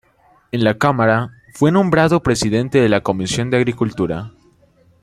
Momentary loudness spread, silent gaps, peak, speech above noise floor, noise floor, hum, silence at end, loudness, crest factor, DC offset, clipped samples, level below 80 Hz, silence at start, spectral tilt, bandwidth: 9 LU; none; -2 dBFS; 39 dB; -54 dBFS; none; 0.75 s; -17 LUFS; 16 dB; under 0.1%; under 0.1%; -44 dBFS; 0.55 s; -6 dB/octave; 14 kHz